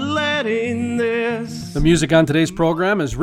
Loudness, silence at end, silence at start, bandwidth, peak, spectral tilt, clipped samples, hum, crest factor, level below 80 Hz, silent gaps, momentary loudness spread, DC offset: -18 LUFS; 0 s; 0 s; 15 kHz; -4 dBFS; -5.5 dB/octave; under 0.1%; none; 14 dB; -34 dBFS; none; 7 LU; under 0.1%